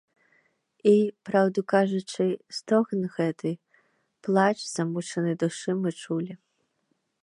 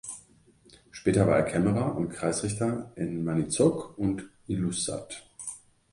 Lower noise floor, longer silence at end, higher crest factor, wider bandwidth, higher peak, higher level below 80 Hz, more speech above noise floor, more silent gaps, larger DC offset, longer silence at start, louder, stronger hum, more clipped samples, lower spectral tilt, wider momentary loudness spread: first, -75 dBFS vs -59 dBFS; first, 0.85 s vs 0.35 s; about the same, 20 dB vs 20 dB; about the same, 11 kHz vs 11.5 kHz; about the same, -8 dBFS vs -8 dBFS; second, -80 dBFS vs -54 dBFS; first, 49 dB vs 32 dB; neither; neither; first, 0.85 s vs 0.05 s; about the same, -26 LUFS vs -28 LUFS; neither; neither; about the same, -6 dB/octave vs -5.5 dB/octave; second, 10 LU vs 15 LU